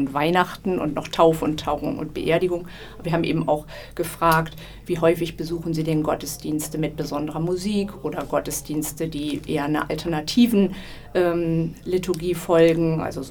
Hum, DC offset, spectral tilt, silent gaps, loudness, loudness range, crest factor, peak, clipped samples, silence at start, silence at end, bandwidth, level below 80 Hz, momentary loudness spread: none; under 0.1%; -5.5 dB/octave; none; -23 LUFS; 4 LU; 20 dB; -2 dBFS; under 0.1%; 0 s; 0 s; 20 kHz; -44 dBFS; 10 LU